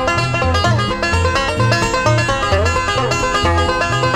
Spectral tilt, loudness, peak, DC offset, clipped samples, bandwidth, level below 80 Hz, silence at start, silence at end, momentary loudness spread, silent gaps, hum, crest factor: -4.5 dB/octave; -15 LUFS; -2 dBFS; under 0.1%; under 0.1%; 14 kHz; -28 dBFS; 0 s; 0 s; 2 LU; none; none; 14 dB